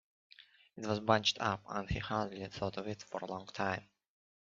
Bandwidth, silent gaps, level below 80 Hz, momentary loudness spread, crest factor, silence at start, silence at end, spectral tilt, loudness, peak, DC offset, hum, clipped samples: 7.6 kHz; none; -58 dBFS; 13 LU; 26 dB; 0.4 s; 0.75 s; -3 dB/octave; -37 LUFS; -12 dBFS; under 0.1%; none; under 0.1%